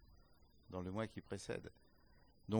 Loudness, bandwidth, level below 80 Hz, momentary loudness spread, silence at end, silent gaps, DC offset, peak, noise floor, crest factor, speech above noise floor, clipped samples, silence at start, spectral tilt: -47 LUFS; over 20 kHz; -68 dBFS; 13 LU; 0 s; none; under 0.1%; -26 dBFS; -69 dBFS; 22 dB; 23 dB; under 0.1%; 0 s; -6.5 dB/octave